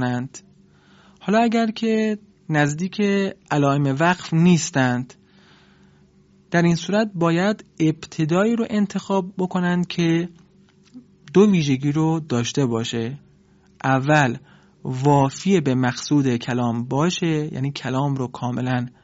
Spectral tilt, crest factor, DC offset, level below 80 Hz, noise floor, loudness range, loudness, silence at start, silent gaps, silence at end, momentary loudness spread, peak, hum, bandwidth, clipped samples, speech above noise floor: -6 dB/octave; 18 dB; under 0.1%; -60 dBFS; -54 dBFS; 2 LU; -21 LUFS; 0 s; none; 0.15 s; 9 LU; -4 dBFS; none; 8 kHz; under 0.1%; 34 dB